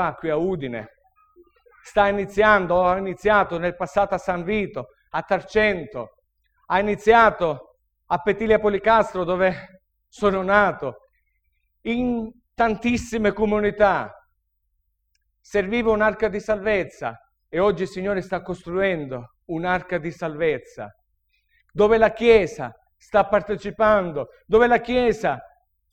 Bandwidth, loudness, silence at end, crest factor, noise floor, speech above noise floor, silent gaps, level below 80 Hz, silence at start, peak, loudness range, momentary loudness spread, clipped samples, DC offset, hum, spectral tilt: 9.2 kHz; -21 LUFS; 0.45 s; 22 dB; -72 dBFS; 51 dB; none; -46 dBFS; 0 s; -2 dBFS; 5 LU; 15 LU; under 0.1%; under 0.1%; none; -6 dB/octave